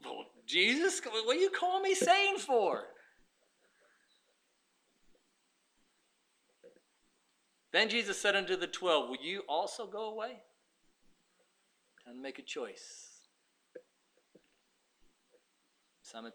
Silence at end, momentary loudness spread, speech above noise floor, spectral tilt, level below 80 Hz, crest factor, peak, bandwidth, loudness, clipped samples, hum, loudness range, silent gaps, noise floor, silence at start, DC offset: 0.05 s; 19 LU; 43 dB; -1.5 dB/octave; -82 dBFS; 24 dB; -14 dBFS; 15.5 kHz; -32 LUFS; under 0.1%; none; 18 LU; none; -76 dBFS; 0 s; under 0.1%